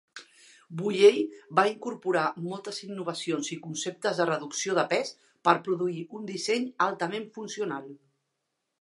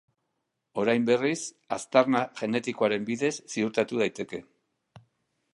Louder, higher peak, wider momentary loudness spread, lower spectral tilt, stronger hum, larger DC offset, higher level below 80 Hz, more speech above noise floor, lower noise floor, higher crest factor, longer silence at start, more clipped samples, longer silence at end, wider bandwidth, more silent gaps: about the same, -28 LUFS vs -27 LUFS; about the same, -6 dBFS vs -6 dBFS; about the same, 13 LU vs 12 LU; about the same, -4 dB/octave vs -4.5 dB/octave; neither; neither; second, -84 dBFS vs -72 dBFS; about the same, 54 dB vs 54 dB; about the same, -82 dBFS vs -80 dBFS; about the same, 22 dB vs 24 dB; second, 0.15 s vs 0.75 s; neither; second, 0.85 s vs 1.15 s; about the same, 11.5 kHz vs 11.5 kHz; neither